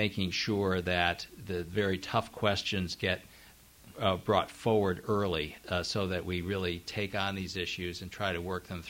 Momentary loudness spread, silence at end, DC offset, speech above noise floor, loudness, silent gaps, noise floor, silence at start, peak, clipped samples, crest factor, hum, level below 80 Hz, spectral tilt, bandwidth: 7 LU; 0 s; under 0.1%; 24 dB; -32 LUFS; none; -57 dBFS; 0 s; -12 dBFS; under 0.1%; 22 dB; none; -56 dBFS; -5 dB/octave; 16 kHz